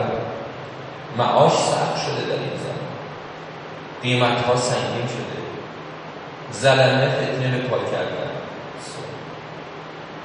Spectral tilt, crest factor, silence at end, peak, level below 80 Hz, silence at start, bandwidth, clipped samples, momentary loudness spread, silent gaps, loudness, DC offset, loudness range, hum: -5 dB/octave; 20 dB; 0 s; -2 dBFS; -60 dBFS; 0 s; 10 kHz; under 0.1%; 18 LU; none; -22 LUFS; under 0.1%; 3 LU; none